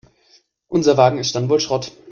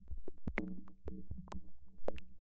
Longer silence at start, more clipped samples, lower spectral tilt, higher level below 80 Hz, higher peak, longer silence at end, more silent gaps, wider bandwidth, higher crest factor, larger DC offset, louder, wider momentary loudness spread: first, 0.7 s vs 0 s; neither; second, -5 dB/octave vs -6.5 dB/octave; about the same, -56 dBFS vs -52 dBFS; first, 0 dBFS vs -20 dBFS; about the same, 0 s vs 0.1 s; neither; about the same, 7.4 kHz vs 7.8 kHz; about the same, 18 dB vs 20 dB; neither; first, -17 LUFS vs -48 LUFS; about the same, 9 LU vs 11 LU